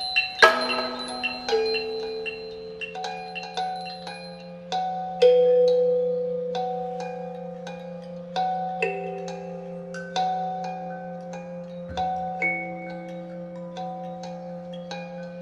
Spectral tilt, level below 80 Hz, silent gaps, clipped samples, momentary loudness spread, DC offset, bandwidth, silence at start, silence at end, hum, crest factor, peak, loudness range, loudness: -4 dB/octave; -60 dBFS; none; under 0.1%; 18 LU; under 0.1%; 11.5 kHz; 0 s; 0 s; none; 26 dB; 0 dBFS; 8 LU; -26 LUFS